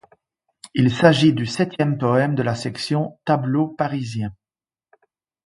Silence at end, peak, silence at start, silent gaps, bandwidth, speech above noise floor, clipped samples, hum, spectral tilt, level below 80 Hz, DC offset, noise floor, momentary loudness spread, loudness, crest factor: 1.1 s; 0 dBFS; 0.75 s; none; 11.5 kHz; over 71 dB; under 0.1%; none; -6.5 dB/octave; -56 dBFS; under 0.1%; under -90 dBFS; 11 LU; -20 LUFS; 20 dB